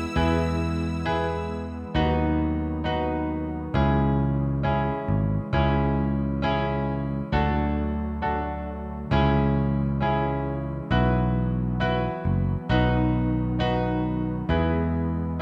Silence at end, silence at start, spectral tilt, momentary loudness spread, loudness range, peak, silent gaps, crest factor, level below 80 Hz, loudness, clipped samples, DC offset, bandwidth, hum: 0 s; 0 s; -8.5 dB/octave; 6 LU; 2 LU; -8 dBFS; none; 16 dB; -32 dBFS; -25 LUFS; under 0.1%; under 0.1%; 8.4 kHz; none